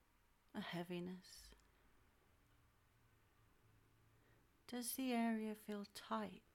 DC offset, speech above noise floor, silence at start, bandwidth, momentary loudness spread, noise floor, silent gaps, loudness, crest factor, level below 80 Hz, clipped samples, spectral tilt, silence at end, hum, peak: under 0.1%; 30 dB; 0.55 s; 17.5 kHz; 19 LU; -76 dBFS; none; -47 LUFS; 18 dB; -78 dBFS; under 0.1%; -4.5 dB/octave; 0.15 s; none; -32 dBFS